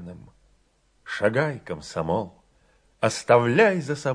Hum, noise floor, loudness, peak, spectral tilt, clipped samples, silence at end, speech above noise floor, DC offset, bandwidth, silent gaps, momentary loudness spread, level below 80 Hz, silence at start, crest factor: none; -64 dBFS; -23 LUFS; -4 dBFS; -5.5 dB/octave; under 0.1%; 0 s; 42 dB; under 0.1%; 10.5 kHz; none; 16 LU; -58 dBFS; 0 s; 20 dB